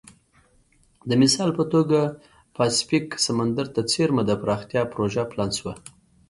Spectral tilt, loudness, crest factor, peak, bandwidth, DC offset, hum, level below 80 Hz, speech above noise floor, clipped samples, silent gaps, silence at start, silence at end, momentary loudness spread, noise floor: -4.5 dB/octave; -23 LUFS; 18 dB; -6 dBFS; 11.5 kHz; under 0.1%; none; -56 dBFS; 38 dB; under 0.1%; none; 1.05 s; 0.4 s; 9 LU; -60 dBFS